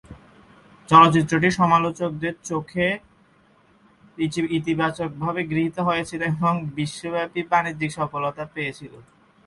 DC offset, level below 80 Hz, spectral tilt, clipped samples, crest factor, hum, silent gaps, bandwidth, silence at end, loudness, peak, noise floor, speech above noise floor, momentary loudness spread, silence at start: under 0.1%; -54 dBFS; -6 dB/octave; under 0.1%; 22 dB; none; none; 11.5 kHz; 0.45 s; -22 LUFS; 0 dBFS; -57 dBFS; 36 dB; 13 LU; 0.1 s